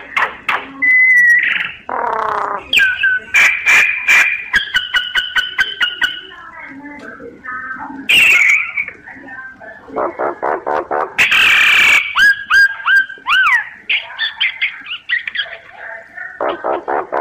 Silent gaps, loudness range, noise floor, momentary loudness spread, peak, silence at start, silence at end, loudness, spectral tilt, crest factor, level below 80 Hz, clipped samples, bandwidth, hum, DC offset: none; 7 LU; -34 dBFS; 23 LU; -2 dBFS; 0 s; 0 s; -12 LUFS; -0.5 dB/octave; 14 dB; -50 dBFS; under 0.1%; 15.5 kHz; none; under 0.1%